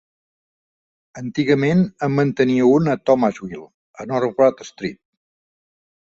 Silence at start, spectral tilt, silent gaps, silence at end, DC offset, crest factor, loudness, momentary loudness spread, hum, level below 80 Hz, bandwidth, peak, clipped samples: 1.15 s; -7.5 dB/octave; 3.74-3.94 s; 1.2 s; under 0.1%; 18 dB; -18 LUFS; 17 LU; none; -58 dBFS; 7.8 kHz; -2 dBFS; under 0.1%